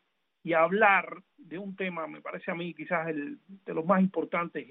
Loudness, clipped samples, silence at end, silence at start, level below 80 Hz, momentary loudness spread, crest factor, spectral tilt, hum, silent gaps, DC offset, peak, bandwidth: -29 LUFS; under 0.1%; 0.05 s; 0.45 s; -80 dBFS; 19 LU; 22 dB; -10 dB/octave; none; none; under 0.1%; -8 dBFS; 4 kHz